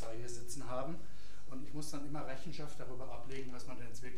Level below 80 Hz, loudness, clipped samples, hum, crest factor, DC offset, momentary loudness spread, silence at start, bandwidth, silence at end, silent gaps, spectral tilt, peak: -60 dBFS; -47 LUFS; under 0.1%; none; 18 dB; 3%; 8 LU; 0 s; 15.5 kHz; 0 s; none; -5 dB/octave; -24 dBFS